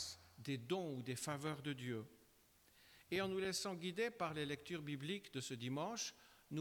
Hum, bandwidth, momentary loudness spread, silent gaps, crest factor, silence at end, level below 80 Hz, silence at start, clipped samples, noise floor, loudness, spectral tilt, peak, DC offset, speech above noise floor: none; 20 kHz; 8 LU; none; 16 dB; 0 s; -78 dBFS; 0 s; under 0.1%; -72 dBFS; -45 LUFS; -4 dB/octave; -30 dBFS; under 0.1%; 27 dB